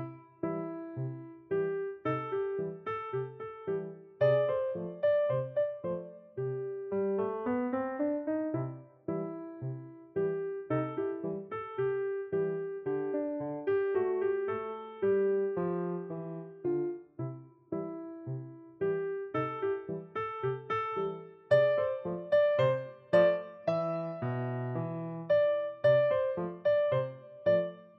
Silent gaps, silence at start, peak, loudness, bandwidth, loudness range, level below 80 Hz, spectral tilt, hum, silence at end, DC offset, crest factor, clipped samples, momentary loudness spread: none; 0 s; -14 dBFS; -33 LUFS; 5.8 kHz; 7 LU; -72 dBFS; -6.5 dB/octave; none; 0.1 s; under 0.1%; 18 dB; under 0.1%; 13 LU